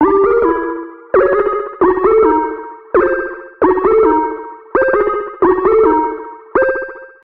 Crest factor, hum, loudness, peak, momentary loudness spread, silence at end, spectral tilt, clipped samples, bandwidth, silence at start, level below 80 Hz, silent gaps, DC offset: 12 dB; none; -14 LUFS; -2 dBFS; 11 LU; 0.15 s; -9.5 dB/octave; under 0.1%; 4 kHz; 0 s; -40 dBFS; none; under 0.1%